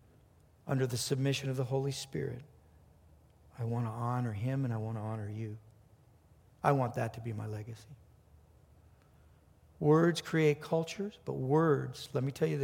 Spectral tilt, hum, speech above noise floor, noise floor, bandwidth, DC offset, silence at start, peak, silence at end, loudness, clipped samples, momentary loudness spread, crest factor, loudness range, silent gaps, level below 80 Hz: -6.5 dB/octave; none; 31 dB; -63 dBFS; 16.5 kHz; under 0.1%; 0.65 s; -12 dBFS; 0 s; -34 LUFS; under 0.1%; 13 LU; 22 dB; 7 LU; none; -66 dBFS